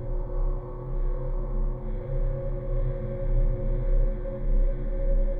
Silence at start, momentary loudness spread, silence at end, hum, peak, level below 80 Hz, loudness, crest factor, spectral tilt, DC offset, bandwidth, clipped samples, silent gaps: 0 s; 5 LU; 0 s; none; -14 dBFS; -26 dBFS; -32 LUFS; 12 dB; -12 dB/octave; 0.4%; 2.3 kHz; under 0.1%; none